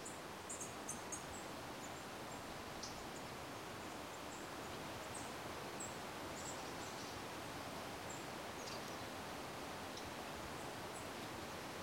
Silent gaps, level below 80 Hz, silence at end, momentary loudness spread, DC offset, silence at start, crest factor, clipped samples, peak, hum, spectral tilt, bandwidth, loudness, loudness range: none; -68 dBFS; 0 s; 2 LU; under 0.1%; 0 s; 16 dB; under 0.1%; -32 dBFS; none; -3 dB/octave; 16.5 kHz; -48 LUFS; 1 LU